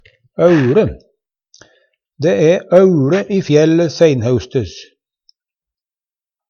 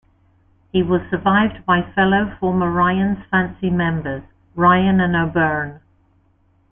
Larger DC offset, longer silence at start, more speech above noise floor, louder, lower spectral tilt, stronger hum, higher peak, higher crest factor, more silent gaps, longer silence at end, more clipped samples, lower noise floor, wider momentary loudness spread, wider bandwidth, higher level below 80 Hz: neither; second, 0.4 s vs 0.75 s; first, over 78 dB vs 41 dB; first, -13 LUFS vs -18 LUFS; second, -7 dB/octave vs -11.5 dB/octave; neither; about the same, 0 dBFS vs -2 dBFS; about the same, 14 dB vs 16 dB; neither; first, 1.65 s vs 0.95 s; neither; first, under -90 dBFS vs -58 dBFS; about the same, 10 LU vs 9 LU; first, 7 kHz vs 3.7 kHz; about the same, -46 dBFS vs -44 dBFS